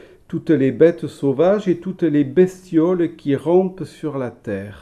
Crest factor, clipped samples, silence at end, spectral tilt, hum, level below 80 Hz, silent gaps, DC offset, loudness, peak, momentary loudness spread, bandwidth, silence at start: 16 dB; under 0.1%; 0.05 s; -8.5 dB/octave; none; -56 dBFS; none; under 0.1%; -19 LUFS; -2 dBFS; 12 LU; 11 kHz; 0.3 s